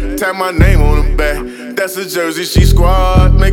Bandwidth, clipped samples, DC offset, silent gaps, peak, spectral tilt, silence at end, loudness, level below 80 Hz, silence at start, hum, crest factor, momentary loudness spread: 16.5 kHz; under 0.1%; under 0.1%; none; 0 dBFS; -5.5 dB/octave; 0 s; -13 LUFS; -12 dBFS; 0 s; none; 10 dB; 8 LU